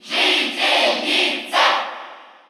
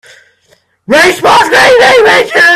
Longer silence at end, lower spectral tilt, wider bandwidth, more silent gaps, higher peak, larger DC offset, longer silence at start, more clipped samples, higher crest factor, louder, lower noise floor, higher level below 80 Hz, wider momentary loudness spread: first, 0.25 s vs 0 s; second, 0 dB/octave vs -2.5 dB/octave; first, over 20 kHz vs 16 kHz; neither; second, -4 dBFS vs 0 dBFS; neither; second, 0.05 s vs 0.9 s; second, under 0.1% vs 1%; first, 16 dB vs 6 dB; second, -17 LUFS vs -5 LUFS; second, -39 dBFS vs -50 dBFS; second, -86 dBFS vs -44 dBFS; first, 8 LU vs 3 LU